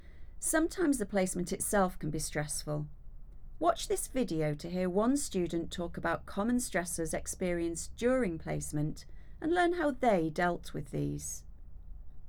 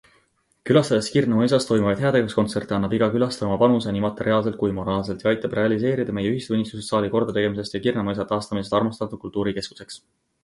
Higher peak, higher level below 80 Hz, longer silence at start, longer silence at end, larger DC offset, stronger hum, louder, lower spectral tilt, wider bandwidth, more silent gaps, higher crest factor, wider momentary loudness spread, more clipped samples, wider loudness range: second, -14 dBFS vs -4 dBFS; about the same, -48 dBFS vs -52 dBFS; second, 0 s vs 0.65 s; second, 0 s vs 0.45 s; neither; neither; second, -33 LUFS vs -22 LUFS; second, -5 dB/octave vs -6.5 dB/octave; first, over 20 kHz vs 11.5 kHz; neither; about the same, 18 dB vs 18 dB; about the same, 9 LU vs 7 LU; neither; about the same, 2 LU vs 4 LU